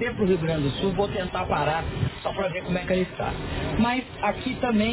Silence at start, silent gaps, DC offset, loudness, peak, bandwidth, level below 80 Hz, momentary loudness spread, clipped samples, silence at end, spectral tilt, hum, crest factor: 0 s; none; under 0.1%; -26 LUFS; -10 dBFS; 4 kHz; -40 dBFS; 5 LU; under 0.1%; 0 s; -10.5 dB/octave; none; 14 dB